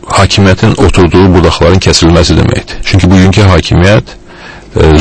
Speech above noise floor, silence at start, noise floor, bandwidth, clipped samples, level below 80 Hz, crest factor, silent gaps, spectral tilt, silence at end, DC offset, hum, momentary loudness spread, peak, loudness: 24 dB; 0.05 s; -28 dBFS; 11 kHz; 4%; -18 dBFS; 6 dB; none; -5.5 dB/octave; 0 s; under 0.1%; none; 5 LU; 0 dBFS; -6 LUFS